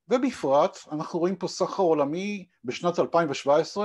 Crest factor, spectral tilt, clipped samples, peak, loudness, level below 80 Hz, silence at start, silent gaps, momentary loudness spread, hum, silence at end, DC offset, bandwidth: 16 dB; -5.5 dB/octave; under 0.1%; -10 dBFS; -26 LUFS; -72 dBFS; 0.1 s; none; 10 LU; none; 0 s; under 0.1%; 11.5 kHz